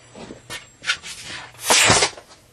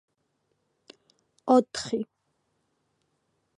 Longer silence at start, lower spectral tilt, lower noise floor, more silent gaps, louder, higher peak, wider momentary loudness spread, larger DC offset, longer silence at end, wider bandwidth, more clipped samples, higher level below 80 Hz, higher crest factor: second, 0.15 s vs 1.45 s; second, -1 dB/octave vs -4.5 dB/octave; second, -40 dBFS vs -76 dBFS; neither; first, -17 LUFS vs -26 LUFS; first, 0 dBFS vs -8 dBFS; first, 21 LU vs 17 LU; neither; second, 0.3 s vs 1.55 s; first, 13.5 kHz vs 10.5 kHz; neither; first, -48 dBFS vs -72 dBFS; about the same, 22 dB vs 24 dB